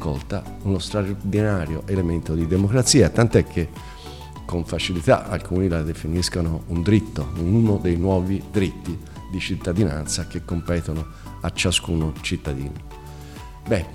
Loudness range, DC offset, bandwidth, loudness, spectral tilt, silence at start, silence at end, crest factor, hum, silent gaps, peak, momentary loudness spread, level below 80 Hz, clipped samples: 5 LU; 0.3%; 15.5 kHz; -22 LUFS; -5.5 dB/octave; 0 s; 0 s; 20 dB; none; none; -2 dBFS; 15 LU; -36 dBFS; under 0.1%